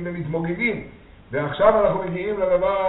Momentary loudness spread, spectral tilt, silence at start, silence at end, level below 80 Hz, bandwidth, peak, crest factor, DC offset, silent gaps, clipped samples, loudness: 10 LU; -5 dB/octave; 0 s; 0 s; -46 dBFS; 4.1 kHz; 0 dBFS; 20 dB; under 0.1%; none; under 0.1%; -22 LUFS